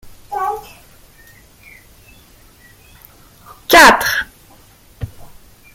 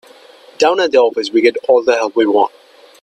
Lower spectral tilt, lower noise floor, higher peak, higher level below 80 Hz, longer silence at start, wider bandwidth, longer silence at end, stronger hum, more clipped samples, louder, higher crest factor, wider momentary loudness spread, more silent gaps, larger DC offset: about the same, -2 dB/octave vs -3 dB/octave; first, -46 dBFS vs -42 dBFS; about the same, 0 dBFS vs 0 dBFS; first, -42 dBFS vs -62 dBFS; second, 0.3 s vs 0.6 s; first, 17 kHz vs 10 kHz; about the same, 0.5 s vs 0.55 s; neither; neither; first, -11 LUFS vs -14 LUFS; about the same, 18 dB vs 14 dB; first, 26 LU vs 3 LU; neither; neither